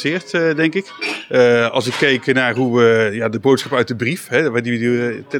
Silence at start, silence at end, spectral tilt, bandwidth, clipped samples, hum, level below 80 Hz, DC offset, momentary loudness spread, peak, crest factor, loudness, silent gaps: 0 s; 0 s; -5.5 dB/octave; 17 kHz; under 0.1%; none; -70 dBFS; under 0.1%; 6 LU; -2 dBFS; 14 dB; -16 LUFS; none